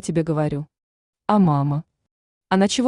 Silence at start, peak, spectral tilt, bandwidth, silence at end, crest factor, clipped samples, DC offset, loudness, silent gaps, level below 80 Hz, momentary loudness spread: 0.05 s; -4 dBFS; -6 dB/octave; 11 kHz; 0 s; 18 dB; under 0.1%; under 0.1%; -21 LUFS; 0.83-1.13 s, 2.11-2.41 s; -54 dBFS; 13 LU